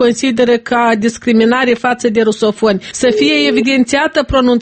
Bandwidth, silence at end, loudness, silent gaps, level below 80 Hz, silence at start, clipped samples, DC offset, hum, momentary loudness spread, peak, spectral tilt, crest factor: 8.8 kHz; 0 s; -12 LUFS; none; -38 dBFS; 0 s; under 0.1%; under 0.1%; none; 3 LU; 0 dBFS; -4 dB/octave; 12 dB